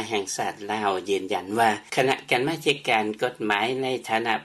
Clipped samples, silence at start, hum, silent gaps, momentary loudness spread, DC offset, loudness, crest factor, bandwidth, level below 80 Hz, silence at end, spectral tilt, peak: under 0.1%; 0 s; none; none; 5 LU; under 0.1%; -25 LUFS; 20 dB; 13.5 kHz; -68 dBFS; 0 s; -3.5 dB/octave; -6 dBFS